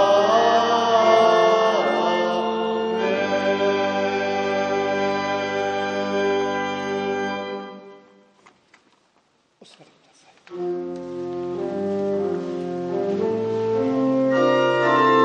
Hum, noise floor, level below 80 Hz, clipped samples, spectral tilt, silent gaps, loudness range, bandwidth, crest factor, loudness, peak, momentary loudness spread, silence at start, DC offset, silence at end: none; -63 dBFS; -68 dBFS; under 0.1%; -5 dB/octave; none; 15 LU; 9.4 kHz; 18 dB; -21 LUFS; -4 dBFS; 12 LU; 0 s; under 0.1%; 0 s